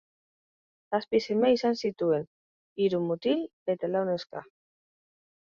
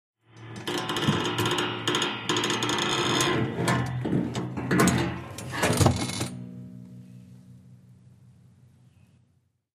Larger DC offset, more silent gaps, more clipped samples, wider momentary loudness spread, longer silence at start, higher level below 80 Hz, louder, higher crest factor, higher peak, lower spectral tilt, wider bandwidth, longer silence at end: neither; first, 2.27-2.76 s, 3.53-3.66 s vs none; neither; second, 12 LU vs 18 LU; first, 0.9 s vs 0.35 s; second, -72 dBFS vs -52 dBFS; about the same, -28 LUFS vs -26 LUFS; about the same, 18 dB vs 22 dB; second, -12 dBFS vs -6 dBFS; first, -6.5 dB/octave vs -4 dB/octave; second, 7.2 kHz vs 15.5 kHz; second, 1.15 s vs 2.05 s